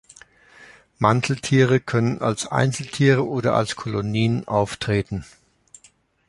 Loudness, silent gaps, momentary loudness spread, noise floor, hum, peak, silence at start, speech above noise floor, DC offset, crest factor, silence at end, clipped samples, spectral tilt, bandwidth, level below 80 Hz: -21 LUFS; none; 6 LU; -57 dBFS; none; -2 dBFS; 0.6 s; 37 dB; under 0.1%; 20 dB; 1.05 s; under 0.1%; -6 dB/octave; 11.5 kHz; -50 dBFS